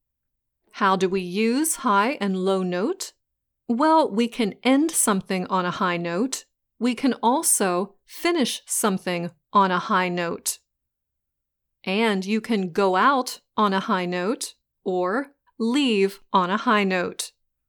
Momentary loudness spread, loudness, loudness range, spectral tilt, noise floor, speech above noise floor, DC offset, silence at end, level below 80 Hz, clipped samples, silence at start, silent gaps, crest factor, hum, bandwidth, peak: 10 LU; -23 LUFS; 2 LU; -4 dB/octave; -81 dBFS; 59 dB; under 0.1%; 0.4 s; -68 dBFS; under 0.1%; 0.75 s; none; 18 dB; none; over 20 kHz; -6 dBFS